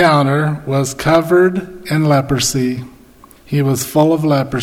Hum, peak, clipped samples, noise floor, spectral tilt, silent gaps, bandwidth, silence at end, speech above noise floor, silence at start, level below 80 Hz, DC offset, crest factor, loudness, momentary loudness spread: none; 0 dBFS; under 0.1%; -43 dBFS; -5.5 dB/octave; none; 16.5 kHz; 0 s; 29 dB; 0 s; -44 dBFS; under 0.1%; 14 dB; -15 LUFS; 8 LU